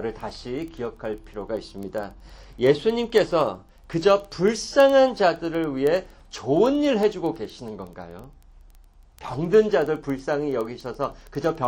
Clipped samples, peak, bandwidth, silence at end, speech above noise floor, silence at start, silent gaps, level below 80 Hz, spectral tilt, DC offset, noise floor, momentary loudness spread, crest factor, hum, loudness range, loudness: under 0.1%; -6 dBFS; 16.5 kHz; 0 s; 28 dB; 0 s; none; -48 dBFS; -5.5 dB/octave; under 0.1%; -51 dBFS; 16 LU; 18 dB; none; 5 LU; -23 LUFS